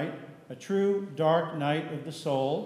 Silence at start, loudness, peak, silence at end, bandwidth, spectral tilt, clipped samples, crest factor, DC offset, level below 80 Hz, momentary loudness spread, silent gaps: 0 s; -29 LUFS; -14 dBFS; 0 s; 13.5 kHz; -6.5 dB/octave; under 0.1%; 16 dB; under 0.1%; -80 dBFS; 17 LU; none